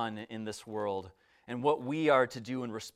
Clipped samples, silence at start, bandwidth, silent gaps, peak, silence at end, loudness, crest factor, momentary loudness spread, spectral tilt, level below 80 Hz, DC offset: under 0.1%; 0 s; 14.5 kHz; none; -14 dBFS; 0.05 s; -33 LUFS; 20 dB; 13 LU; -5.5 dB/octave; -76 dBFS; under 0.1%